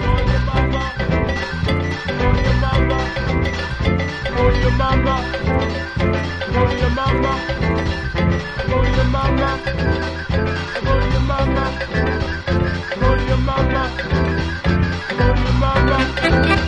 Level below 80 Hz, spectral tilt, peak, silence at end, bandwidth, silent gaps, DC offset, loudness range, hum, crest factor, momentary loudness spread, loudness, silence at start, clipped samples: -22 dBFS; -7 dB/octave; -2 dBFS; 0 s; 9 kHz; none; under 0.1%; 1 LU; none; 16 dB; 5 LU; -19 LUFS; 0 s; under 0.1%